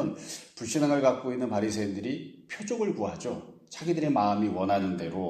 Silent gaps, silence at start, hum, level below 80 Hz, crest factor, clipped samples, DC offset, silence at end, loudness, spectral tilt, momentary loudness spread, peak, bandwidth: none; 0 s; none; -66 dBFS; 18 dB; under 0.1%; under 0.1%; 0 s; -29 LUFS; -5.5 dB/octave; 14 LU; -10 dBFS; 14.5 kHz